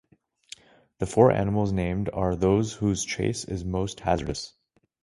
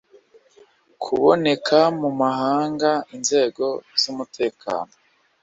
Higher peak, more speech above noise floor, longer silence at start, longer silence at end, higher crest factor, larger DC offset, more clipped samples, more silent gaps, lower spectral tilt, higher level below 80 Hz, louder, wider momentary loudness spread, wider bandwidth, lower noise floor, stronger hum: about the same, -4 dBFS vs -2 dBFS; second, 26 dB vs 34 dB; about the same, 1 s vs 1 s; about the same, 0.55 s vs 0.6 s; about the same, 22 dB vs 20 dB; neither; neither; neither; first, -6 dB/octave vs -3.5 dB/octave; first, -44 dBFS vs -64 dBFS; second, -26 LUFS vs -21 LUFS; first, 20 LU vs 11 LU; first, 11.5 kHz vs 8 kHz; second, -50 dBFS vs -54 dBFS; neither